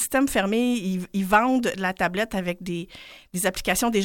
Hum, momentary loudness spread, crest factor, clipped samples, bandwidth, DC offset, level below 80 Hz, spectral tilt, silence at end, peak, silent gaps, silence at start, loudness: none; 12 LU; 20 dB; under 0.1%; 17 kHz; under 0.1%; -48 dBFS; -4 dB/octave; 0 s; -4 dBFS; none; 0 s; -24 LUFS